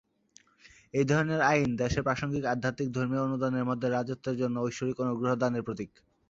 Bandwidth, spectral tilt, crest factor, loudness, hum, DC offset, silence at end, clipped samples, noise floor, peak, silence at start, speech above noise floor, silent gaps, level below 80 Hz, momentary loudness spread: 7.8 kHz; -6.5 dB/octave; 20 dB; -30 LUFS; none; under 0.1%; 0.4 s; under 0.1%; -62 dBFS; -10 dBFS; 0.65 s; 33 dB; none; -54 dBFS; 8 LU